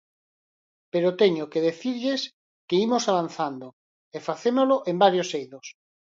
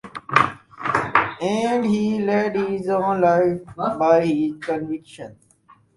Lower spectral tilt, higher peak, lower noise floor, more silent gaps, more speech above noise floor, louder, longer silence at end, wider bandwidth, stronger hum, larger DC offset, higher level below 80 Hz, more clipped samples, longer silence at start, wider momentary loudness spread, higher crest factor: second, -5 dB/octave vs -6.5 dB/octave; second, -4 dBFS vs 0 dBFS; first, under -90 dBFS vs -55 dBFS; first, 2.33-2.68 s, 3.73-4.12 s vs none; first, over 66 dB vs 34 dB; second, -24 LUFS vs -21 LUFS; second, 0.4 s vs 0.65 s; second, 7.8 kHz vs 11.5 kHz; neither; neither; second, -76 dBFS vs -58 dBFS; neither; first, 0.95 s vs 0.05 s; first, 16 LU vs 11 LU; about the same, 20 dB vs 20 dB